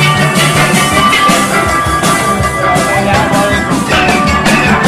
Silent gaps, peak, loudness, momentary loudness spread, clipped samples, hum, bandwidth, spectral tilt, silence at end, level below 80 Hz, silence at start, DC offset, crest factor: none; 0 dBFS; -9 LUFS; 3 LU; under 0.1%; none; 15.5 kHz; -4 dB/octave; 0 s; -28 dBFS; 0 s; under 0.1%; 10 dB